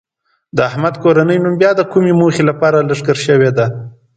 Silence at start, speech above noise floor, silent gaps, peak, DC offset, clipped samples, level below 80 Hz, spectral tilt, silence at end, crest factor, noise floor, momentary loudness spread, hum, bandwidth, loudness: 0.55 s; 31 dB; none; 0 dBFS; under 0.1%; under 0.1%; -52 dBFS; -7 dB/octave; 0.25 s; 12 dB; -42 dBFS; 6 LU; none; 9.2 kHz; -13 LUFS